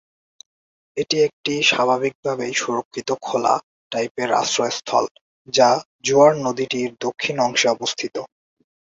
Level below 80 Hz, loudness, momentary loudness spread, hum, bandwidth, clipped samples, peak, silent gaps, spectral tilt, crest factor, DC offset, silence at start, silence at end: -66 dBFS; -20 LUFS; 11 LU; none; 7.8 kHz; under 0.1%; -2 dBFS; 1.33-1.44 s, 2.15-2.23 s, 2.85-2.91 s, 3.63-3.90 s, 4.11-4.15 s, 5.11-5.15 s, 5.21-5.45 s, 5.85-5.99 s; -3 dB/octave; 20 dB; under 0.1%; 0.95 s; 0.55 s